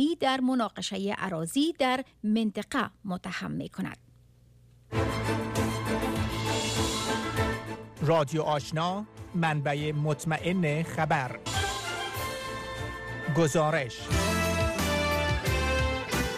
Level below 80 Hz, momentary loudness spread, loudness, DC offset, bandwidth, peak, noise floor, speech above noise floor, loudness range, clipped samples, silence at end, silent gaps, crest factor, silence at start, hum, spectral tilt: -42 dBFS; 9 LU; -29 LUFS; under 0.1%; 15.5 kHz; -14 dBFS; -58 dBFS; 29 dB; 5 LU; under 0.1%; 0 s; none; 14 dB; 0 s; none; -5 dB/octave